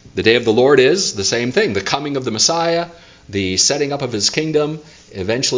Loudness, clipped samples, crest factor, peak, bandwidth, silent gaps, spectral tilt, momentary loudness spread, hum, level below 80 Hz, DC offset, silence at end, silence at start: -16 LUFS; under 0.1%; 16 dB; 0 dBFS; 7.8 kHz; none; -3 dB/octave; 11 LU; none; -46 dBFS; under 0.1%; 0 s; 0.05 s